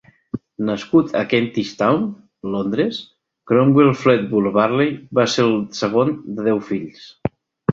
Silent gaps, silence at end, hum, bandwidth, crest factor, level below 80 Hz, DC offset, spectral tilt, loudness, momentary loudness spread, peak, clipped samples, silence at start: none; 0 s; none; 7.8 kHz; 18 dB; -54 dBFS; under 0.1%; -6.5 dB/octave; -19 LUFS; 14 LU; 0 dBFS; under 0.1%; 0.35 s